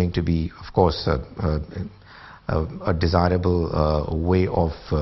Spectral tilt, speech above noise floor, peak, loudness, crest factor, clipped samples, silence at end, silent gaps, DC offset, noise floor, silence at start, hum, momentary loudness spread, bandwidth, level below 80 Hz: -8.5 dB/octave; 22 dB; -2 dBFS; -23 LUFS; 20 dB; under 0.1%; 0 s; none; under 0.1%; -43 dBFS; 0 s; none; 8 LU; 6 kHz; -36 dBFS